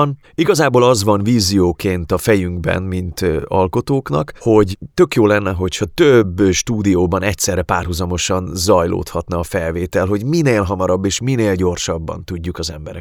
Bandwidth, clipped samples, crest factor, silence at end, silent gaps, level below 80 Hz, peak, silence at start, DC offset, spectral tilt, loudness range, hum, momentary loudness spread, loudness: 18.5 kHz; under 0.1%; 16 dB; 0 s; none; -36 dBFS; 0 dBFS; 0 s; under 0.1%; -5 dB/octave; 3 LU; none; 9 LU; -16 LUFS